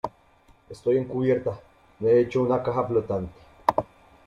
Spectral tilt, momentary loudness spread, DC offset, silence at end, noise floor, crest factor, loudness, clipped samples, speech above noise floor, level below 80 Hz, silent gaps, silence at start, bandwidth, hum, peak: -8.5 dB/octave; 14 LU; under 0.1%; 0.45 s; -58 dBFS; 22 dB; -25 LUFS; under 0.1%; 34 dB; -56 dBFS; none; 0.05 s; 10.5 kHz; none; -4 dBFS